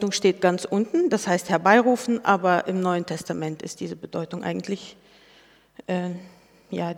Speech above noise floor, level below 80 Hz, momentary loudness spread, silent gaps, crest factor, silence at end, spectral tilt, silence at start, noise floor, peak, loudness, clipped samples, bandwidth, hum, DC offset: 32 dB; -68 dBFS; 15 LU; none; 22 dB; 0 s; -5 dB/octave; 0 s; -55 dBFS; -2 dBFS; -24 LUFS; under 0.1%; 16 kHz; none; under 0.1%